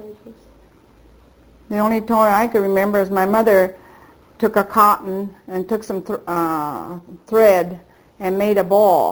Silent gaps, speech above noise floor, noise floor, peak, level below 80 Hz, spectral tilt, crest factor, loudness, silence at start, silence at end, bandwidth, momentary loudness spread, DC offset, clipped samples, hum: none; 33 dB; -50 dBFS; 0 dBFS; -52 dBFS; -6 dB/octave; 18 dB; -17 LUFS; 0 s; 0 s; over 20 kHz; 14 LU; under 0.1%; under 0.1%; none